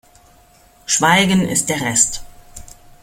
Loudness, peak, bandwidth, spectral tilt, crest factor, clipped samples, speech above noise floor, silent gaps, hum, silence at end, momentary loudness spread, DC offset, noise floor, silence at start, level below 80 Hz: -15 LUFS; 0 dBFS; 16.5 kHz; -2.5 dB/octave; 20 dB; under 0.1%; 34 dB; none; none; 0.3 s; 11 LU; under 0.1%; -50 dBFS; 0.9 s; -44 dBFS